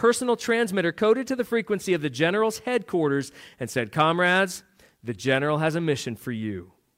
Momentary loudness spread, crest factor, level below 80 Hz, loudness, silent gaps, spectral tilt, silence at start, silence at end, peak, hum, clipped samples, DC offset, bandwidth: 12 LU; 16 dB; -66 dBFS; -24 LUFS; none; -5 dB/octave; 0 s; 0.3 s; -8 dBFS; none; under 0.1%; under 0.1%; 16 kHz